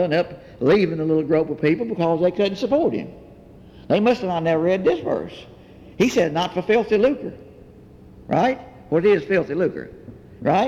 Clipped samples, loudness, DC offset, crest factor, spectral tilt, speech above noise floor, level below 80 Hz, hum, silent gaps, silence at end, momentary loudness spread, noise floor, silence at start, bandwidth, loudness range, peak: under 0.1%; -21 LUFS; under 0.1%; 14 dB; -6.5 dB/octave; 25 dB; -52 dBFS; none; none; 0 s; 12 LU; -45 dBFS; 0 s; 14 kHz; 2 LU; -6 dBFS